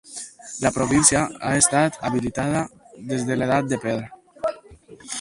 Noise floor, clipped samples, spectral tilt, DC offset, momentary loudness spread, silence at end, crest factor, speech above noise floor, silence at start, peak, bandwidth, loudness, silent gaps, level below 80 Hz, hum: -46 dBFS; under 0.1%; -4 dB/octave; under 0.1%; 18 LU; 0 s; 24 dB; 25 dB; 0.05 s; 0 dBFS; 11.5 kHz; -21 LUFS; none; -48 dBFS; none